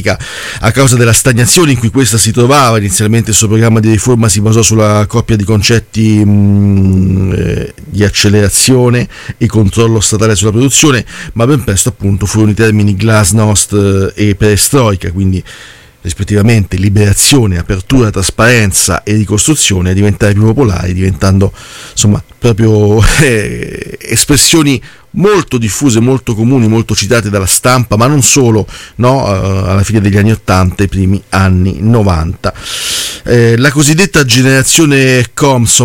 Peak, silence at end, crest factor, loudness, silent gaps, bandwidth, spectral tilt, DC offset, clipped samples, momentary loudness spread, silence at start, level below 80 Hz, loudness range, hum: 0 dBFS; 0 s; 8 dB; -8 LUFS; none; 17 kHz; -4.5 dB/octave; under 0.1%; 0.3%; 7 LU; 0 s; -28 dBFS; 3 LU; none